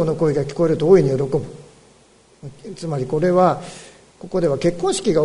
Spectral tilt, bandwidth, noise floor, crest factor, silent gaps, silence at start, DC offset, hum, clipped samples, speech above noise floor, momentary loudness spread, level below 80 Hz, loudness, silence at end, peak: -6.5 dB/octave; 11 kHz; -52 dBFS; 18 dB; none; 0 s; under 0.1%; none; under 0.1%; 34 dB; 22 LU; -48 dBFS; -19 LUFS; 0 s; -2 dBFS